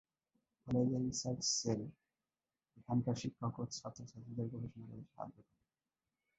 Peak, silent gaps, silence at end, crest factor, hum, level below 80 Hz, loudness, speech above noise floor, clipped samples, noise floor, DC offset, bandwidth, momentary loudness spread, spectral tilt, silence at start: -24 dBFS; none; 0.95 s; 18 dB; none; -70 dBFS; -40 LUFS; over 50 dB; under 0.1%; under -90 dBFS; under 0.1%; 8.2 kHz; 17 LU; -5 dB/octave; 0.65 s